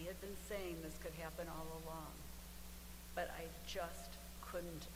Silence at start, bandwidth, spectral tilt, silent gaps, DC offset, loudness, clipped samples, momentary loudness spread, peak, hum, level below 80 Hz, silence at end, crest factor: 0 s; 16 kHz; -4 dB/octave; none; under 0.1%; -49 LUFS; under 0.1%; 8 LU; -28 dBFS; none; -56 dBFS; 0 s; 20 dB